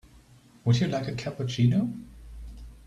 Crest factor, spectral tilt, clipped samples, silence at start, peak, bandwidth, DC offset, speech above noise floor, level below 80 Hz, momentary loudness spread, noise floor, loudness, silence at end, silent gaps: 18 dB; -7 dB/octave; under 0.1%; 0.65 s; -10 dBFS; 9.4 kHz; under 0.1%; 30 dB; -48 dBFS; 22 LU; -55 dBFS; -27 LUFS; 0.1 s; none